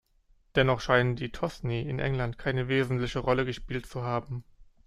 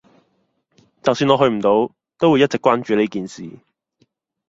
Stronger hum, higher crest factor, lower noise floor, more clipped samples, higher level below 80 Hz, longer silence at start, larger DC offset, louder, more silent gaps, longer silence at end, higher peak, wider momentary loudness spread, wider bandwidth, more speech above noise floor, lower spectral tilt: neither; about the same, 22 dB vs 18 dB; about the same, -64 dBFS vs -66 dBFS; neither; first, -46 dBFS vs -58 dBFS; second, 0.55 s vs 1.05 s; neither; second, -29 LUFS vs -18 LUFS; neither; second, 0.25 s vs 1 s; second, -8 dBFS vs -2 dBFS; second, 9 LU vs 14 LU; first, 11.5 kHz vs 8 kHz; second, 36 dB vs 50 dB; about the same, -6.5 dB/octave vs -6 dB/octave